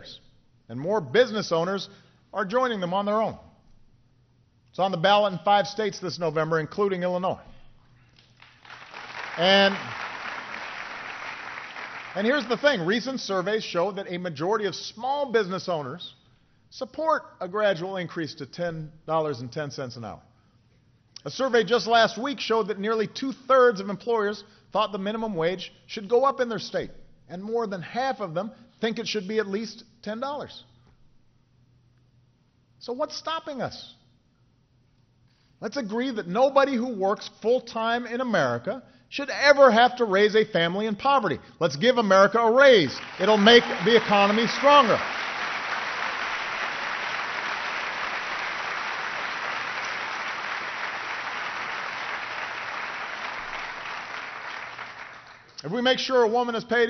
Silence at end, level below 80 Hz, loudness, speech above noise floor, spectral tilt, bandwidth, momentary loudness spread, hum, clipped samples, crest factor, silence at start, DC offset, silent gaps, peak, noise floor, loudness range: 0 s; -62 dBFS; -25 LUFS; 40 dB; -2 dB/octave; 6.6 kHz; 17 LU; none; under 0.1%; 22 dB; 0 s; under 0.1%; none; -4 dBFS; -63 dBFS; 13 LU